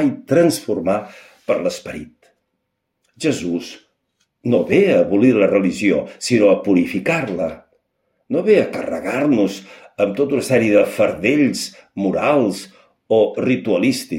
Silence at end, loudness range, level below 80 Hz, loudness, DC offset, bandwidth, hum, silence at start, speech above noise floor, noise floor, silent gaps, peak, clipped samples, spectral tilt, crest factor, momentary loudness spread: 0 s; 8 LU; -56 dBFS; -17 LUFS; under 0.1%; 16.5 kHz; none; 0 s; 57 dB; -74 dBFS; none; -2 dBFS; under 0.1%; -5.5 dB/octave; 16 dB; 12 LU